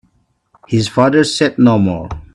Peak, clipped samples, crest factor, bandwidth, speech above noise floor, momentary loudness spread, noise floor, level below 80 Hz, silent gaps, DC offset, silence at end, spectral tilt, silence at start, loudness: 0 dBFS; under 0.1%; 14 dB; 11.5 kHz; 46 dB; 7 LU; -59 dBFS; -40 dBFS; none; under 0.1%; 0.1 s; -6 dB/octave; 0.7 s; -13 LUFS